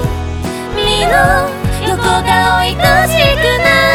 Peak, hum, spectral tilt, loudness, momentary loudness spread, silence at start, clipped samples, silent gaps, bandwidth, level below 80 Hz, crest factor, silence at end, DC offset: 0 dBFS; none; -4 dB/octave; -11 LUFS; 10 LU; 0 s; under 0.1%; none; 19 kHz; -24 dBFS; 12 dB; 0 s; under 0.1%